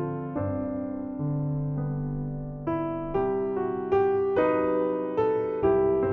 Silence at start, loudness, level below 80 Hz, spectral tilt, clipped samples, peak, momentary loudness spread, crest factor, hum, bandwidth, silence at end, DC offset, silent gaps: 0 s; -27 LUFS; -48 dBFS; -8.5 dB/octave; under 0.1%; -12 dBFS; 8 LU; 14 dB; none; 3.8 kHz; 0 s; under 0.1%; none